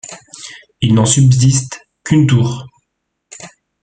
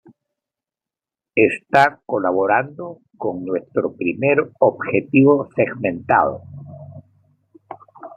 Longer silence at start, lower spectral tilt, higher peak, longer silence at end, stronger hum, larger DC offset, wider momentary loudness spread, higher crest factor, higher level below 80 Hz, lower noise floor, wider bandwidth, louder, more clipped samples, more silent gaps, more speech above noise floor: second, 0.1 s vs 1.35 s; second, -5 dB/octave vs -8 dB/octave; about the same, 0 dBFS vs -2 dBFS; first, 0.35 s vs 0.1 s; neither; neither; first, 23 LU vs 20 LU; about the same, 14 dB vs 18 dB; first, -44 dBFS vs -64 dBFS; second, -72 dBFS vs -89 dBFS; about the same, 9.4 kHz vs 9.4 kHz; first, -12 LUFS vs -18 LUFS; neither; neither; second, 61 dB vs 71 dB